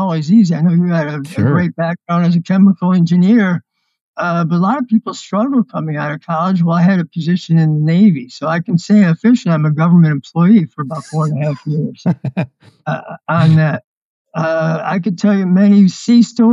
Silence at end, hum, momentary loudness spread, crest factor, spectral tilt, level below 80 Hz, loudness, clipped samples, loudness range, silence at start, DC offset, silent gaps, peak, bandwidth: 0 s; none; 10 LU; 12 dB; -8 dB/octave; -60 dBFS; -14 LUFS; under 0.1%; 4 LU; 0 s; under 0.1%; 4.01-4.14 s, 13.84-14.25 s; -2 dBFS; 7.8 kHz